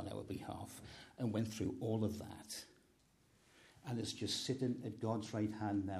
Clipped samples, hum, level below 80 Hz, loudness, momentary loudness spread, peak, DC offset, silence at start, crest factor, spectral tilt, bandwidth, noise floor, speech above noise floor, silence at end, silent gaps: under 0.1%; none; -70 dBFS; -42 LUFS; 11 LU; -24 dBFS; under 0.1%; 0 s; 18 dB; -5.5 dB/octave; 14.5 kHz; -72 dBFS; 31 dB; 0 s; none